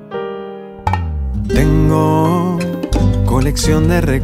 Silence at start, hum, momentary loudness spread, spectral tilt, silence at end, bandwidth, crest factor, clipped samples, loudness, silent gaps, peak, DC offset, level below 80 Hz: 0 s; none; 12 LU; -6.5 dB/octave; 0 s; 16 kHz; 14 dB; under 0.1%; -15 LUFS; none; 0 dBFS; under 0.1%; -22 dBFS